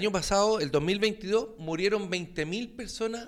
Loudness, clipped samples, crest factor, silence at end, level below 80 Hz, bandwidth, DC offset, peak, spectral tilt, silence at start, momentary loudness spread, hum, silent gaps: -29 LUFS; under 0.1%; 14 dB; 0 s; -50 dBFS; 15 kHz; under 0.1%; -14 dBFS; -4 dB/octave; 0 s; 9 LU; none; none